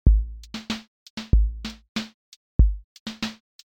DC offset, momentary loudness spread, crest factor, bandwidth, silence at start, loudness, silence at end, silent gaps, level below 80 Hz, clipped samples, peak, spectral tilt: under 0.1%; 16 LU; 20 dB; 8.2 kHz; 0.05 s; -27 LUFS; 0.35 s; 0.88-1.17 s, 1.89-1.95 s, 2.14-2.59 s, 2.84-3.06 s; -24 dBFS; under 0.1%; -4 dBFS; -6 dB/octave